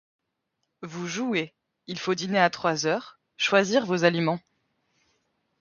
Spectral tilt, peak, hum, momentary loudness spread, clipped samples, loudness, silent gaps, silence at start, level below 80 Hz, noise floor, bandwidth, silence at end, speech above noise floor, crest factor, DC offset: -4.5 dB/octave; -6 dBFS; none; 14 LU; under 0.1%; -25 LUFS; none; 0.8 s; -72 dBFS; -79 dBFS; 7.4 kHz; 1.2 s; 54 dB; 22 dB; under 0.1%